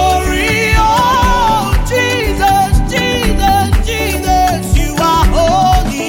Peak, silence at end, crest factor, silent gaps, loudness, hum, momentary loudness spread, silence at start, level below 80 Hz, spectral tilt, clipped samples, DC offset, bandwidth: 0 dBFS; 0 s; 10 dB; none; -12 LUFS; none; 4 LU; 0 s; -16 dBFS; -4.5 dB/octave; under 0.1%; under 0.1%; 17 kHz